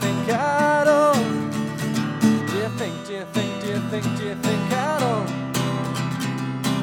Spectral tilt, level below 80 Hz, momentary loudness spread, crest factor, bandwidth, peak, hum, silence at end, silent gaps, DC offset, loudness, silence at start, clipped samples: -5.5 dB/octave; -58 dBFS; 9 LU; 16 dB; 17 kHz; -6 dBFS; none; 0 s; none; under 0.1%; -22 LUFS; 0 s; under 0.1%